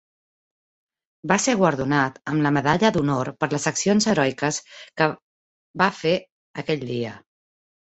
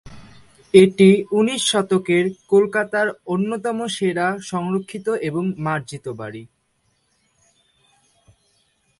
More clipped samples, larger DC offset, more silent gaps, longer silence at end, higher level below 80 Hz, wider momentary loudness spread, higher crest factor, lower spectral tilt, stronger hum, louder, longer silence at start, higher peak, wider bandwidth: neither; neither; first, 5.22-5.74 s, 6.32-6.54 s vs none; second, 0.75 s vs 2.55 s; about the same, -58 dBFS vs -60 dBFS; about the same, 14 LU vs 13 LU; about the same, 20 dB vs 20 dB; about the same, -4.5 dB/octave vs -5 dB/octave; neither; second, -22 LUFS vs -19 LUFS; first, 1.25 s vs 0.05 s; second, -4 dBFS vs 0 dBFS; second, 8.2 kHz vs 11.5 kHz